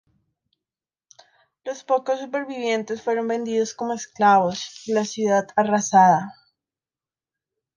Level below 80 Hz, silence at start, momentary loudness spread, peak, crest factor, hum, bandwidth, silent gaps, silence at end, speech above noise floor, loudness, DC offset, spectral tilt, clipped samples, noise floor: -70 dBFS; 1.65 s; 13 LU; -4 dBFS; 20 dB; none; 10 kHz; none; 1.45 s; over 69 dB; -21 LUFS; under 0.1%; -4.5 dB/octave; under 0.1%; under -90 dBFS